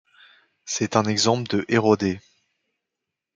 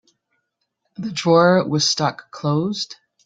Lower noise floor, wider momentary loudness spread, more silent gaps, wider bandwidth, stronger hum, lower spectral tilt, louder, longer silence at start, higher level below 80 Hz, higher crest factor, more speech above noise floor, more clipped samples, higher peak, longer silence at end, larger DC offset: first, -84 dBFS vs -74 dBFS; second, 11 LU vs 14 LU; neither; about the same, 9.6 kHz vs 9.4 kHz; neither; about the same, -4.5 dB/octave vs -4.5 dB/octave; second, -22 LUFS vs -19 LUFS; second, 0.65 s vs 1 s; about the same, -66 dBFS vs -62 dBFS; about the same, 22 dB vs 18 dB; first, 63 dB vs 55 dB; neither; about the same, -2 dBFS vs -2 dBFS; first, 1.15 s vs 0.3 s; neither